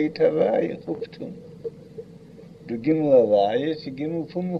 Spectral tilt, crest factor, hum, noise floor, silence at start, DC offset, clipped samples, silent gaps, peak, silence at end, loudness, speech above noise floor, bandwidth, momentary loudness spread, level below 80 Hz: -8.5 dB/octave; 16 dB; none; -45 dBFS; 0 s; under 0.1%; under 0.1%; none; -6 dBFS; 0 s; -23 LUFS; 22 dB; 6.2 kHz; 21 LU; -62 dBFS